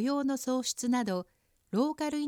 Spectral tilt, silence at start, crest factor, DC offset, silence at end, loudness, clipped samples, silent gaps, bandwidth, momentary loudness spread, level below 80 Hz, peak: -4 dB/octave; 0 s; 14 dB; under 0.1%; 0 s; -31 LUFS; under 0.1%; none; 18 kHz; 6 LU; -72 dBFS; -18 dBFS